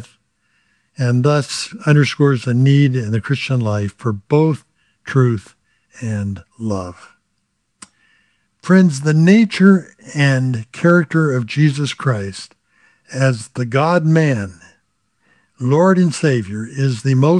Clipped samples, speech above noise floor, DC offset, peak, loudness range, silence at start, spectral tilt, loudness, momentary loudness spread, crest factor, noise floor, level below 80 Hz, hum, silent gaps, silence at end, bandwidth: under 0.1%; 54 dB; under 0.1%; 0 dBFS; 7 LU; 0 s; -7 dB/octave; -16 LUFS; 13 LU; 16 dB; -69 dBFS; -62 dBFS; none; none; 0 s; 11 kHz